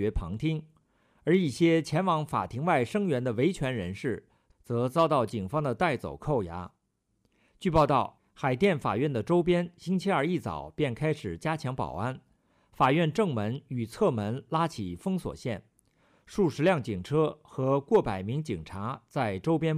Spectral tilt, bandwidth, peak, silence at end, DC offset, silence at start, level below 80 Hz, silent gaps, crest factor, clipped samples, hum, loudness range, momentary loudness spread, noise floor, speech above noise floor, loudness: -7 dB/octave; 14.5 kHz; -12 dBFS; 0 s; under 0.1%; 0 s; -50 dBFS; none; 16 dB; under 0.1%; none; 3 LU; 11 LU; -74 dBFS; 46 dB; -29 LUFS